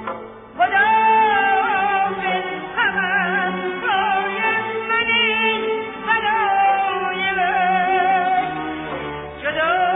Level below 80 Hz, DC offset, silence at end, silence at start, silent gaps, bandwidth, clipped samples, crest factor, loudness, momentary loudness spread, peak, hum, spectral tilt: -54 dBFS; under 0.1%; 0 s; 0 s; none; 3.9 kHz; under 0.1%; 12 dB; -18 LUFS; 11 LU; -6 dBFS; none; -7 dB/octave